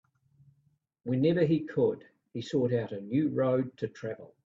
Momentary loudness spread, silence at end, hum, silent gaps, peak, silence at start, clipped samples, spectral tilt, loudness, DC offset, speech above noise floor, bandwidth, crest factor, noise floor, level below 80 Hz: 14 LU; 0.2 s; none; none; -14 dBFS; 1.05 s; under 0.1%; -8.5 dB/octave; -30 LUFS; under 0.1%; 42 dB; 7.6 kHz; 16 dB; -71 dBFS; -70 dBFS